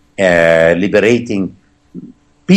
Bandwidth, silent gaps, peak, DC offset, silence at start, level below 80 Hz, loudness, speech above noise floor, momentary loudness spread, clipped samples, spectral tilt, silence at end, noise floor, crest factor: 10.5 kHz; none; 0 dBFS; under 0.1%; 0.2 s; -48 dBFS; -11 LUFS; 26 dB; 13 LU; under 0.1%; -6 dB/octave; 0 s; -37 dBFS; 12 dB